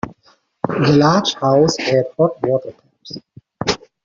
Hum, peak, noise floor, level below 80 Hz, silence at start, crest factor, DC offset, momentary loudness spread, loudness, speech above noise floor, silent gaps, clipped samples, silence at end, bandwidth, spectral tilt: none; -2 dBFS; -56 dBFS; -52 dBFS; 0.05 s; 16 dB; under 0.1%; 21 LU; -16 LUFS; 41 dB; none; under 0.1%; 0.3 s; 7.6 kHz; -5 dB/octave